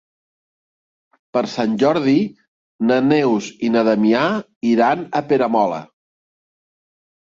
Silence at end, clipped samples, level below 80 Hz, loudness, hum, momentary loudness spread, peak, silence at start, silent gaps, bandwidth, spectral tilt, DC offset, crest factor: 1.55 s; under 0.1%; -62 dBFS; -18 LUFS; none; 7 LU; -2 dBFS; 1.35 s; 2.48-2.79 s, 4.56-4.61 s; 7.6 kHz; -6.5 dB/octave; under 0.1%; 16 dB